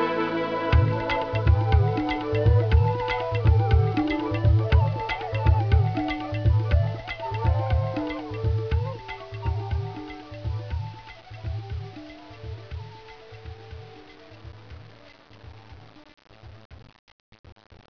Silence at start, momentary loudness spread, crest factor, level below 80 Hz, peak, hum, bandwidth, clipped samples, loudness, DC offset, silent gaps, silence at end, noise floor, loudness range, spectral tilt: 0 s; 22 LU; 18 dB; -32 dBFS; -8 dBFS; none; 5.4 kHz; under 0.1%; -25 LUFS; 0.2%; 16.65-16.70 s; 1.2 s; -50 dBFS; 20 LU; -8.5 dB/octave